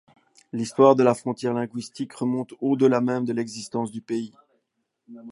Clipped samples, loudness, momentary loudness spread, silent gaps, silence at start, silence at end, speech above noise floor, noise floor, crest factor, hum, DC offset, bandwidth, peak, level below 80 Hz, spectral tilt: under 0.1%; -24 LUFS; 15 LU; none; 0.55 s; 0 s; 53 dB; -76 dBFS; 22 dB; none; under 0.1%; 11.5 kHz; -2 dBFS; -72 dBFS; -6.5 dB/octave